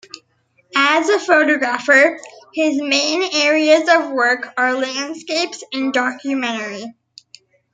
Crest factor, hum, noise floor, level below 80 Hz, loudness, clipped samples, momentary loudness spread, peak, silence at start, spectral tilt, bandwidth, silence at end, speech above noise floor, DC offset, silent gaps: 18 dB; none; -61 dBFS; -72 dBFS; -16 LUFS; under 0.1%; 11 LU; 0 dBFS; 0.15 s; -1.5 dB/octave; 9.6 kHz; 0.8 s; 44 dB; under 0.1%; none